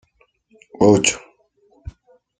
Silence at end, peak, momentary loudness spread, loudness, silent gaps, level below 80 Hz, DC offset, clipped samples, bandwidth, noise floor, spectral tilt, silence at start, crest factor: 0.5 s; -2 dBFS; 27 LU; -16 LUFS; none; -48 dBFS; under 0.1%; under 0.1%; 9.4 kHz; -61 dBFS; -4 dB/octave; 0.8 s; 20 dB